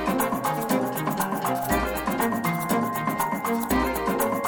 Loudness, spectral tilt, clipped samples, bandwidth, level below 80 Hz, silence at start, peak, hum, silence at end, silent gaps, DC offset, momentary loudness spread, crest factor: -25 LUFS; -5 dB/octave; under 0.1%; over 20 kHz; -42 dBFS; 0 s; -10 dBFS; none; 0 s; none; under 0.1%; 2 LU; 16 dB